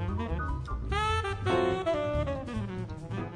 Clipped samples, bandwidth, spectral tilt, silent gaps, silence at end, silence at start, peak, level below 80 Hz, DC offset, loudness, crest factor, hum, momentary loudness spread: under 0.1%; 11 kHz; -6.5 dB/octave; none; 0 s; 0 s; -14 dBFS; -38 dBFS; under 0.1%; -31 LUFS; 16 dB; none; 9 LU